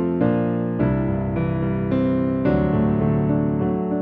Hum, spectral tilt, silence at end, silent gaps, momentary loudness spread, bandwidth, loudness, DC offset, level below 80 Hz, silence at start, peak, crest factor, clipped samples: none; -12 dB/octave; 0 s; none; 3 LU; 4.7 kHz; -21 LUFS; under 0.1%; -38 dBFS; 0 s; -6 dBFS; 14 dB; under 0.1%